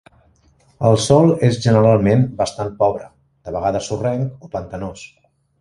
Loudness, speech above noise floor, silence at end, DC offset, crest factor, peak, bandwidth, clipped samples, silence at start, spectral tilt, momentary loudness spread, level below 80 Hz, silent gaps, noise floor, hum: -17 LUFS; 39 dB; 0.55 s; under 0.1%; 18 dB; 0 dBFS; 11.5 kHz; under 0.1%; 0.8 s; -6.5 dB/octave; 16 LU; -46 dBFS; none; -55 dBFS; none